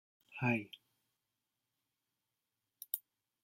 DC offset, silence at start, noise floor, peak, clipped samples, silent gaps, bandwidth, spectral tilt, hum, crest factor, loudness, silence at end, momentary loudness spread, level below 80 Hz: under 0.1%; 0.3 s; -89 dBFS; -16 dBFS; under 0.1%; none; 16 kHz; -5.5 dB/octave; none; 28 dB; -39 LUFS; 0.45 s; 19 LU; -84 dBFS